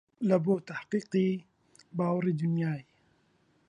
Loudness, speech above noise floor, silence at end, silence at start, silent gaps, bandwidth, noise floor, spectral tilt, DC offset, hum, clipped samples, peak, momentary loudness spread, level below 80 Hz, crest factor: -31 LUFS; 40 dB; 0.85 s; 0.2 s; none; 10 kHz; -69 dBFS; -8.5 dB/octave; under 0.1%; none; under 0.1%; -12 dBFS; 9 LU; -74 dBFS; 20 dB